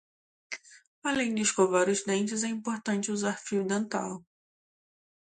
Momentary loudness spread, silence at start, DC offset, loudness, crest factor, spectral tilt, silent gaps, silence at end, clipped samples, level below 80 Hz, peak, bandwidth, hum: 17 LU; 0.5 s; under 0.1%; -29 LUFS; 20 dB; -3.5 dB/octave; 0.87-1.02 s; 1.2 s; under 0.1%; -72 dBFS; -10 dBFS; 9.6 kHz; none